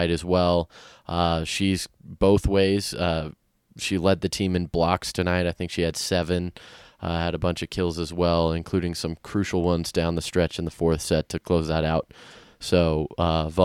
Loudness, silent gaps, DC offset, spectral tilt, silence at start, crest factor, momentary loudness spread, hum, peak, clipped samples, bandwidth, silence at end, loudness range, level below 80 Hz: -24 LUFS; none; under 0.1%; -5.5 dB/octave; 0 s; 20 dB; 8 LU; none; -4 dBFS; under 0.1%; 15.5 kHz; 0 s; 2 LU; -40 dBFS